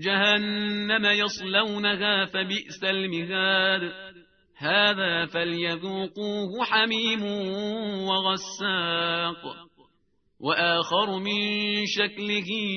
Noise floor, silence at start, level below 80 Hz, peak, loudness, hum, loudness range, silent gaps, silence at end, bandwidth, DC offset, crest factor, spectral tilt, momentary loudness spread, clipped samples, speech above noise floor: -71 dBFS; 0 s; -68 dBFS; -6 dBFS; -25 LUFS; none; 3 LU; none; 0 s; 6.6 kHz; under 0.1%; 20 dB; -4 dB/octave; 9 LU; under 0.1%; 45 dB